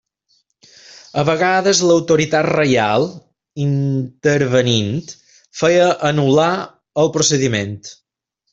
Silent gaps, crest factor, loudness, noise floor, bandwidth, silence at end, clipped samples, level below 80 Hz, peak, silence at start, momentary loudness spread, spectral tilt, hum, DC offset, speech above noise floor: none; 16 dB; -16 LUFS; -74 dBFS; 8 kHz; 0.6 s; under 0.1%; -54 dBFS; -2 dBFS; 1.15 s; 12 LU; -4.5 dB/octave; none; under 0.1%; 58 dB